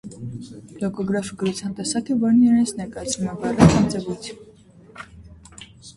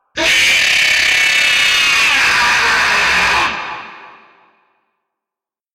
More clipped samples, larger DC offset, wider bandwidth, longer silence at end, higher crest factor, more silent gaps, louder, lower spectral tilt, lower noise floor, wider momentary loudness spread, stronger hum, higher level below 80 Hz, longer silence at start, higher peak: neither; neither; second, 11.5 kHz vs 16 kHz; second, 0.05 s vs 1.65 s; first, 22 dB vs 10 dB; neither; second, -21 LUFS vs -10 LUFS; first, -6 dB/octave vs 0.5 dB/octave; second, -48 dBFS vs -87 dBFS; first, 25 LU vs 6 LU; neither; about the same, -42 dBFS vs -44 dBFS; about the same, 0.05 s vs 0.15 s; first, 0 dBFS vs -6 dBFS